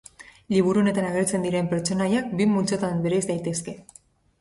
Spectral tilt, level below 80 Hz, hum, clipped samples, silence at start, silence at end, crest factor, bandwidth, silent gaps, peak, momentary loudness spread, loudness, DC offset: -5.5 dB/octave; -58 dBFS; none; under 0.1%; 0.2 s; 0.6 s; 16 dB; 11.5 kHz; none; -8 dBFS; 7 LU; -24 LUFS; under 0.1%